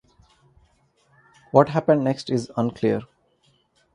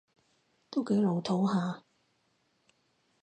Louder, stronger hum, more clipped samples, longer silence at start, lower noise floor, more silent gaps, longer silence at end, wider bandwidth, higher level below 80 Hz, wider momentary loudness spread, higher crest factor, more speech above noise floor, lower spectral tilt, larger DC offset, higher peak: first, -22 LUFS vs -31 LUFS; neither; neither; first, 1.55 s vs 0.7 s; second, -64 dBFS vs -74 dBFS; neither; second, 0.9 s vs 1.45 s; first, 11 kHz vs 9 kHz; first, -60 dBFS vs -78 dBFS; about the same, 8 LU vs 9 LU; first, 24 dB vs 16 dB; about the same, 43 dB vs 45 dB; about the same, -7.5 dB/octave vs -7.5 dB/octave; neither; first, 0 dBFS vs -18 dBFS